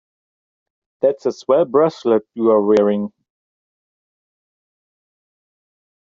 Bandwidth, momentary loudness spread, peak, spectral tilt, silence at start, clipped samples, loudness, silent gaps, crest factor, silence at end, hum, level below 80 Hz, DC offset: 7.4 kHz; 9 LU; -4 dBFS; -6.5 dB/octave; 1.05 s; under 0.1%; -17 LUFS; none; 18 dB; 3.05 s; none; -66 dBFS; under 0.1%